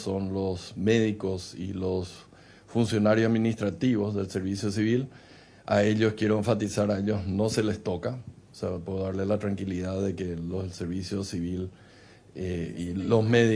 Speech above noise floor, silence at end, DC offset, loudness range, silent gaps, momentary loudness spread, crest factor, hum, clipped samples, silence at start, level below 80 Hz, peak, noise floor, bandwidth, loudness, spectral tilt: 26 dB; 0 s; under 0.1%; 5 LU; none; 12 LU; 20 dB; none; under 0.1%; 0 s; -56 dBFS; -8 dBFS; -53 dBFS; 11 kHz; -28 LUFS; -6.5 dB/octave